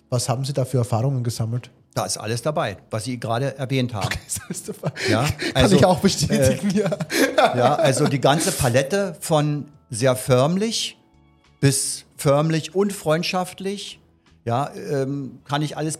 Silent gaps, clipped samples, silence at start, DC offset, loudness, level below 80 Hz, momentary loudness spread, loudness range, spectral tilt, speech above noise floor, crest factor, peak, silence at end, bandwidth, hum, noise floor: none; under 0.1%; 0.1 s; under 0.1%; -21 LUFS; -48 dBFS; 11 LU; 7 LU; -5 dB/octave; 35 dB; 20 dB; 0 dBFS; 0 s; 16 kHz; none; -55 dBFS